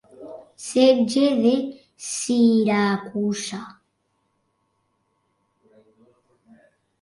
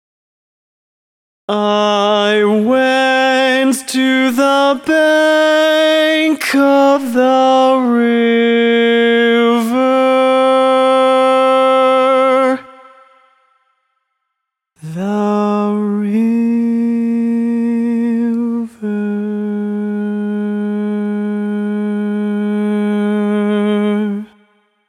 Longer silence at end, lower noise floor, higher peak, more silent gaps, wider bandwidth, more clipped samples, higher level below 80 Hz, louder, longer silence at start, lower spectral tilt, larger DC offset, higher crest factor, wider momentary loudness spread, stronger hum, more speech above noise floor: first, 3.3 s vs 0.65 s; second, -71 dBFS vs -76 dBFS; second, -6 dBFS vs 0 dBFS; neither; second, 11.5 kHz vs 16 kHz; neither; about the same, -70 dBFS vs -66 dBFS; second, -20 LUFS vs -13 LUFS; second, 0.2 s vs 1.5 s; about the same, -4.5 dB/octave vs -5 dB/octave; neither; first, 18 dB vs 12 dB; first, 19 LU vs 8 LU; neither; second, 51 dB vs 65 dB